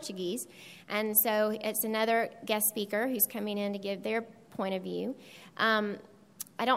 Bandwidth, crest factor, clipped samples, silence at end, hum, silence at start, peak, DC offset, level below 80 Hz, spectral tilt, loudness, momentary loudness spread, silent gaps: 16 kHz; 20 dB; under 0.1%; 0 s; none; 0 s; -12 dBFS; under 0.1%; -80 dBFS; -3 dB/octave; -31 LUFS; 17 LU; none